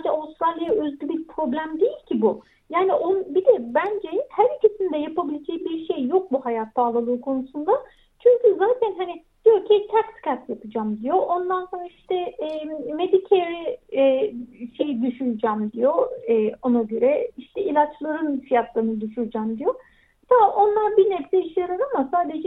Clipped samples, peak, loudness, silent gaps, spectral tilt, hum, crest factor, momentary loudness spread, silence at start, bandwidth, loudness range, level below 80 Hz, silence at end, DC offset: under 0.1%; -4 dBFS; -22 LUFS; none; -8.5 dB/octave; none; 18 dB; 10 LU; 0 s; 4 kHz; 3 LU; -62 dBFS; 0 s; under 0.1%